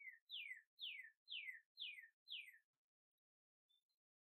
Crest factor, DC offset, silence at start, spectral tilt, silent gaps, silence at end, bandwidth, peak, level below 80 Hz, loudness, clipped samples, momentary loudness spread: 18 dB; under 0.1%; 0 s; 5 dB/octave; 0.21-0.27 s, 0.67-0.77 s, 1.17-1.26 s, 1.66-1.75 s, 2.13-2.26 s, 2.64-3.69 s; 0.5 s; 13 kHz; -40 dBFS; under -90 dBFS; -54 LUFS; under 0.1%; 5 LU